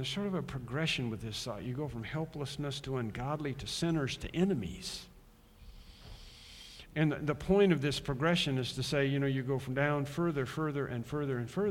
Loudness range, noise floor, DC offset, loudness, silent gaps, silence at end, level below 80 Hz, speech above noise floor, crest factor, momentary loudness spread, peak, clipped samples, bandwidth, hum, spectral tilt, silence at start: 6 LU; -59 dBFS; under 0.1%; -34 LUFS; none; 0 s; -54 dBFS; 25 dB; 20 dB; 12 LU; -14 dBFS; under 0.1%; 16.5 kHz; none; -5.5 dB/octave; 0 s